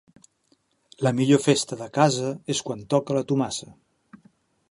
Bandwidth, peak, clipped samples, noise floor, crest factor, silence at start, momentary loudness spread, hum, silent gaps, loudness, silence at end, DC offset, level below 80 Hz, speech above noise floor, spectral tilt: 11.5 kHz; -4 dBFS; under 0.1%; -67 dBFS; 22 dB; 1 s; 9 LU; none; none; -24 LUFS; 1 s; under 0.1%; -64 dBFS; 44 dB; -5 dB/octave